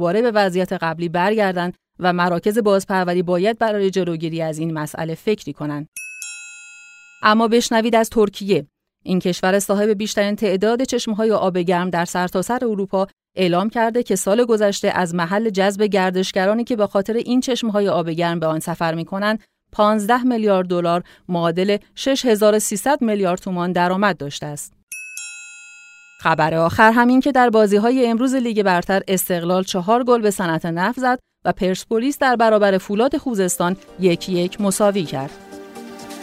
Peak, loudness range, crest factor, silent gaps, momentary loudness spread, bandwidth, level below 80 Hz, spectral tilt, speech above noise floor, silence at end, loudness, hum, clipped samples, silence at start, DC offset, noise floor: 0 dBFS; 5 LU; 18 dB; 5.88-5.92 s, 24.83-24.87 s; 12 LU; 16 kHz; -54 dBFS; -5 dB/octave; 26 dB; 0 s; -18 LUFS; none; under 0.1%; 0 s; under 0.1%; -44 dBFS